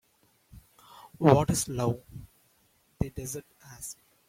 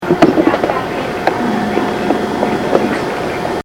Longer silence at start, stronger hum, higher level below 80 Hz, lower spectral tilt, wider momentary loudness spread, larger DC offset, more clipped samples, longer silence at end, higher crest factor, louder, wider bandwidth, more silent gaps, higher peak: first, 0.55 s vs 0 s; neither; second, -52 dBFS vs -42 dBFS; about the same, -6 dB/octave vs -6 dB/octave; first, 19 LU vs 7 LU; neither; second, under 0.1% vs 0.2%; first, 0.35 s vs 0.05 s; first, 26 dB vs 14 dB; second, -28 LUFS vs -15 LUFS; about the same, 16.5 kHz vs 17 kHz; neither; second, -6 dBFS vs 0 dBFS